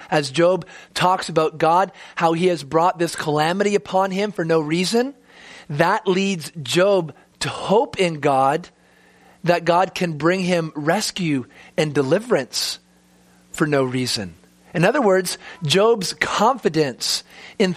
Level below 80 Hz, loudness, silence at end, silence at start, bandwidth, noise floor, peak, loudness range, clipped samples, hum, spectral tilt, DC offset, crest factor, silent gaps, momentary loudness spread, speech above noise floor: -60 dBFS; -20 LUFS; 0 s; 0 s; 15.5 kHz; -54 dBFS; -2 dBFS; 3 LU; under 0.1%; none; -4.5 dB/octave; under 0.1%; 18 dB; none; 9 LU; 35 dB